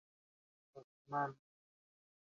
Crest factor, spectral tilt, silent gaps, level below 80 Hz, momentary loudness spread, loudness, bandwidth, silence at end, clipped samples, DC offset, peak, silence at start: 22 dB; -6 dB/octave; 0.84-1.05 s; under -90 dBFS; 22 LU; -42 LUFS; 7.2 kHz; 1 s; under 0.1%; under 0.1%; -28 dBFS; 0.75 s